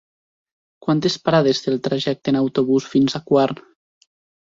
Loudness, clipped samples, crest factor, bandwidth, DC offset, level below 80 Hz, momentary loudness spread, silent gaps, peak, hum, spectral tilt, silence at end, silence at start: -19 LUFS; under 0.1%; 18 dB; 7.8 kHz; under 0.1%; -60 dBFS; 5 LU; none; -2 dBFS; none; -6 dB/octave; 0.85 s; 0.85 s